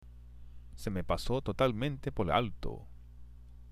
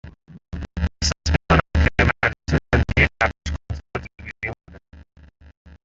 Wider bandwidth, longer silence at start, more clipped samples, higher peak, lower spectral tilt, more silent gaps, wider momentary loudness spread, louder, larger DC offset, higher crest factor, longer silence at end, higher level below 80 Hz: first, 15.5 kHz vs 7.8 kHz; about the same, 0 s vs 0.05 s; neither; second, -14 dBFS vs -2 dBFS; first, -6.5 dB/octave vs -5 dB/octave; neither; first, 25 LU vs 15 LU; second, -34 LUFS vs -21 LUFS; neither; about the same, 22 dB vs 20 dB; second, 0 s vs 0.9 s; second, -46 dBFS vs -30 dBFS